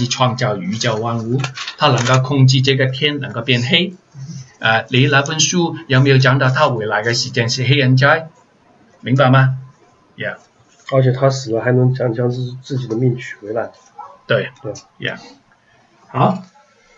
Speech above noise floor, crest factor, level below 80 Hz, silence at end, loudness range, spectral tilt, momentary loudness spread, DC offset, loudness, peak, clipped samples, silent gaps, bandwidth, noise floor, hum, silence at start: 38 dB; 16 dB; -58 dBFS; 0.55 s; 8 LU; -5 dB/octave; 15 LU; under 0.1%; -16 LUFS; 0 dBFS; under 0.1%; none; 7.8 kHz; -53 dBFS; none; 0 s